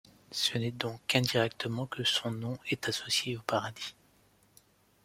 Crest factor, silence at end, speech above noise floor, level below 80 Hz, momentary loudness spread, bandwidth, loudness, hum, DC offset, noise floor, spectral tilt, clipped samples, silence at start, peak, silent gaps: 24 dB; 1.15 s; 33 dB; -68 dBFS; 9 LU; 16.5 kHz; -32 LUFS; none; under 0.1%; -66 dBFS; -3.5 dB/octave; under 0.1%; 0.3 s; -10 dBFS; none